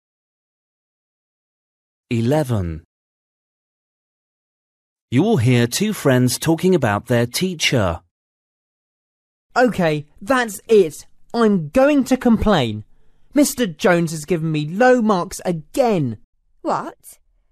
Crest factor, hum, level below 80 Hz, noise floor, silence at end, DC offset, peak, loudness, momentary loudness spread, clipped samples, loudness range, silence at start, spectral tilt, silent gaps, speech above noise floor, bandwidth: 16 dB; none; -44 dBFS; under -90 dBFS; 0.4 s; under 0.1%; -4 dBFS; -18 LUFS; 10 LU; under 0.1%; 9 LU; 2.1 s; -5.5 dB/octave; 2.85-4.96 s, 5.02-5.08 s, 8.11-9.50 s, 16.24-16.33 s; over 73 dB; 14 kHz